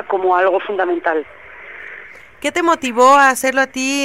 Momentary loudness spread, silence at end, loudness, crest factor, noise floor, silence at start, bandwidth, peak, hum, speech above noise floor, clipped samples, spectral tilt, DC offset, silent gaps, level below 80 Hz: 23 LU; 0 s; -15 LUFS; 14 dB; -38 dBFS; 0 s; 16 kHz; -2 dBFS; none; 23 dB; under 0.1%; -2 dB/octave; 0.4%; none; -58 dBFS